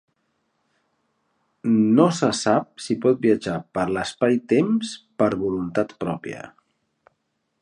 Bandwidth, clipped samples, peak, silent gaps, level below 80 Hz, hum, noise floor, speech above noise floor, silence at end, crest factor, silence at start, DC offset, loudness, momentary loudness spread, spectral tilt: 11 kHz; under 0.1%; -2 dBFS; none; -58 dBFS; none; -74 dBFS; 52 dB; 1.15 s; 22 dB; 1.65 s; under 0.1%; -22 LUFS; 11 LU; -6 dB/octave